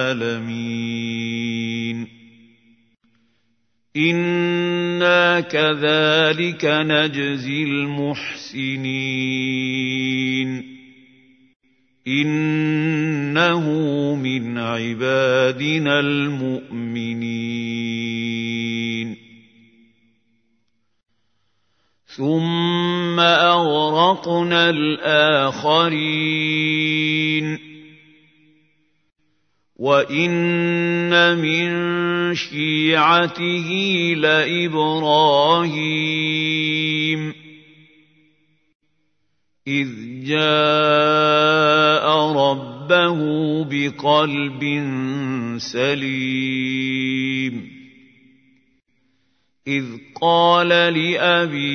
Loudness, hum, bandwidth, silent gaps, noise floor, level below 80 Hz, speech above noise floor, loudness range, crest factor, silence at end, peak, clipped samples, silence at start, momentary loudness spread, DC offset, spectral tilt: -18 LUFS; none; 6.6 kHz; 11.56-11.60 s, 38.75-38.80 s; -74 dBFS; -70 dBFS; 55 dB; 10 LU; 20 dB; 0 s; 0 dBFS; under 0.1%; 0 s; 10 LU; under 0.1%; -5.5 dB/octave